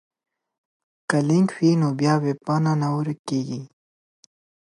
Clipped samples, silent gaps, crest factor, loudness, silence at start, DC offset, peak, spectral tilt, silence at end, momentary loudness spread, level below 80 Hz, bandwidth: under 0.1%; 3.19-3.25 s; 20 dB; -22 LUFS; 1.1 s; under 0.1%; -4 dBFS; -7 dB/octave; 1.1 s; 9 LU; -70 dBFS; 11.5 kHz